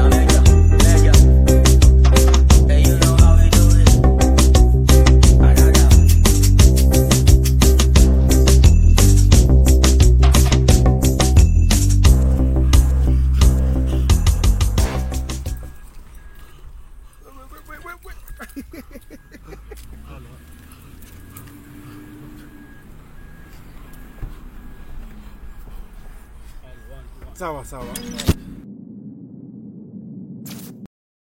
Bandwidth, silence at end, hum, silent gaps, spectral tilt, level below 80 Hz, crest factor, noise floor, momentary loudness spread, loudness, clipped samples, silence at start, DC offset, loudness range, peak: 15 kHz; 0.45 s; none; none; -5.5 dB/octave; -16 dBFS; 14 dB; -41 dBFS; 19 LU; -14 LUFS; under 0.1%; 0 s; under 0.1%; 17 LU; 0 dBFS